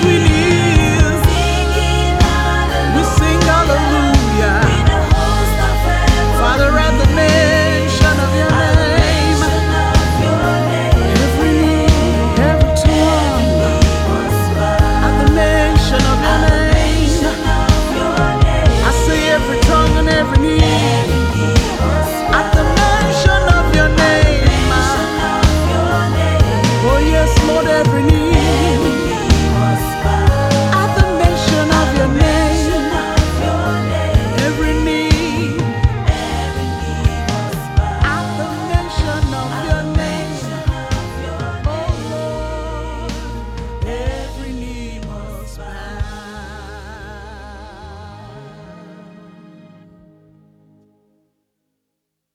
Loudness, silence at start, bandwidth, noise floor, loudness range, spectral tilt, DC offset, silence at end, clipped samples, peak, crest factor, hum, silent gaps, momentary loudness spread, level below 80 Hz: -14 LUFS; 0 s; 15.5 kHz; -76 dBFS; 12 LU; -5.5 dB/octave; under 0.1%; 3.4 s; under 0.1%; 0 dBFS; 14 dB; none; none; 13 LU; -18 dBFS